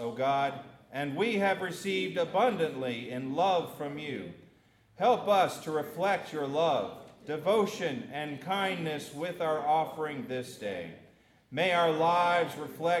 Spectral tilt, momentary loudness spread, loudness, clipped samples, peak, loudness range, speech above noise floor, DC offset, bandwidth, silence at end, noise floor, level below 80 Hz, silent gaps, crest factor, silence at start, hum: -5 dB/octave; 12 LU; -30 LUFS; under 0.1%; -14 dBFS; 3 LU; 33 dB; under 0.1%; 16 kHz; 0 s; -63 dBFS; -76 dBFS; none; 16 dB; 0 s; none